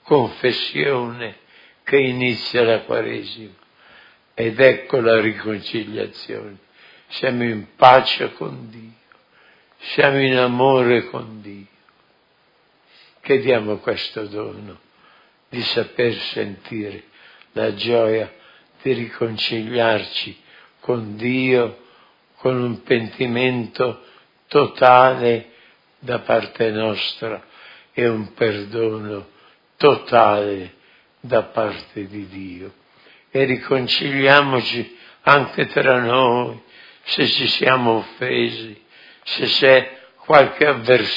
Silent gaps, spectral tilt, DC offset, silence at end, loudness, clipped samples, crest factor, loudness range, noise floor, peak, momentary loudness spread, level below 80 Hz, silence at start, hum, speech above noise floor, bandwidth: none; -7 dB/octave; under 0.1%; 0 s; -18 LUFS; under 0.1%; 20 dB; 7 LU; -59 dBFS; 0 dBFS; 19 LU; -64 dBFS; 0.05 s; none; 41 dB; 6 kHz